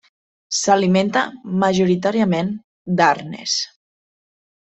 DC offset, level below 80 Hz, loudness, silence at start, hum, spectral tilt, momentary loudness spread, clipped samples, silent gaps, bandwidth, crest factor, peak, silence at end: under 0.1%; -60 dBFS; -19 LUFS; 0.5 s; none; -4.5 dB/octave; 8 LU; under 0.1%; 2.64-2.85 s; 8.4 kHz; 18 dB; -2 dBFS; 0.95 s